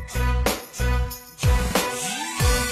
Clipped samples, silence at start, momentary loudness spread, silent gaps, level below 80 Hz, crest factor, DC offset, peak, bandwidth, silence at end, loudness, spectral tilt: under 0.1%; 0 s; 5 LU; none; -26 dBFS; 18 dB; under 0.1%; -6 dBFS; 15 kHz; 0 s; -24 LUFS; -4 dB/octave